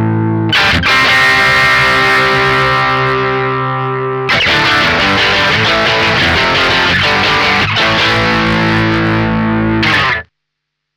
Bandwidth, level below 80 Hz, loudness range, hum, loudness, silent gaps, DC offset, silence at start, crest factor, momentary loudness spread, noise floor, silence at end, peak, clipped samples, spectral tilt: over 20 kHz; -32 dBFS; 2 LU; none; -10 LUFS; none; under 0.1%; 0 s; 8 dB; 6 LU; -74 dBFS; 0.75 s; -4 dBFS; under 0.1%; -4.5 dB/octave